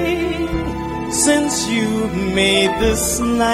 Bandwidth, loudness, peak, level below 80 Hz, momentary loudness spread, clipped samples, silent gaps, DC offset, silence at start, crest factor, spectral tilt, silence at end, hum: 16 kHz; -17 LUFS; -2 dBFS; -32 dBFS; 7 LU; under 0.1%; none; under 0.1%; 0 s; 16 dB; -3.5 dB/octave; 0 s; none